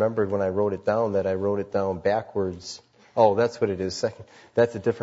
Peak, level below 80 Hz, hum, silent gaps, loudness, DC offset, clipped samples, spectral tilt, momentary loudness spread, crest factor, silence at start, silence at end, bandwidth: -6 dBFS; -62 dBFS; none; none; -25 LUFS; under 0.1%; under 0.1%; -6 dB/octave; 10 LU; 20 dB; 0 s; 0 s; 8 kHz